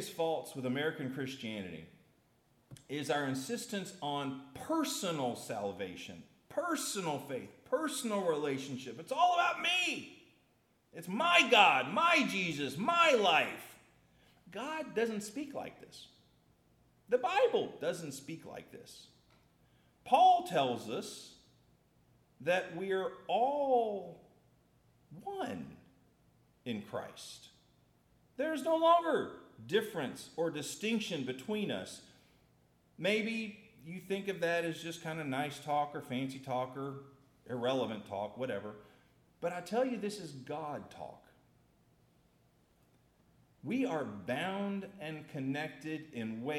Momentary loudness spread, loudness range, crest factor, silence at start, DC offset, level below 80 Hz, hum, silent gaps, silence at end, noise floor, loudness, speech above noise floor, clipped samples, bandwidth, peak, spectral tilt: 21 LU; 12 LU; 24 dB; 0 s; under 0.1%; -78 dBFS; none; none; 0 s; -72 dBFS; -34 LUFS; 38 dB; under 0.1%; 16.5 kHz; -12 dBFS; -4 dB/octave